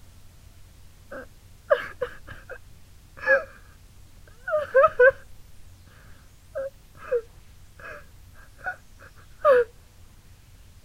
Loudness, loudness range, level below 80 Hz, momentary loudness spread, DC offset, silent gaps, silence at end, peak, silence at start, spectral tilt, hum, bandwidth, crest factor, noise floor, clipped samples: -24 LUFS; 12 LU; -52 dBFS; 25 LU; under 0.1%; none; 1.2 s; -6 dBFS; 1.1 s; -4.5 dB/octave; none; 15.5 kHz; 22 dB; -50 dBFS; under 0.1%